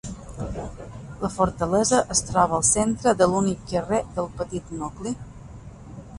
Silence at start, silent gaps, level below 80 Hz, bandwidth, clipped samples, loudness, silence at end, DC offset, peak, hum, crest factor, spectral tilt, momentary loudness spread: 0.05 s; none; -42 dBFS; 11.5 kHz; under 0.1%; -23 LUFS; 0 s; under 0.1%; -4 dBFS; none; 20 dB; -4.5 dB/octave; 21 LU